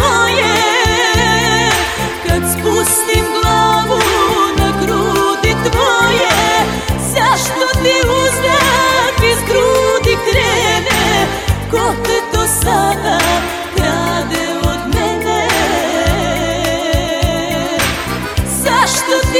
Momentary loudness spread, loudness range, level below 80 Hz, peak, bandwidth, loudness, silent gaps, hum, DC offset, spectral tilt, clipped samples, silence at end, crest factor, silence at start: 5 LU; 3 LU; -26 dBFS; 0 dBFS; 17.5 kHz; -13 LUFS; none; none; under 0.1%; -3.5 dB/octave; under 0.1%; 0 s; 12 dB; 0 s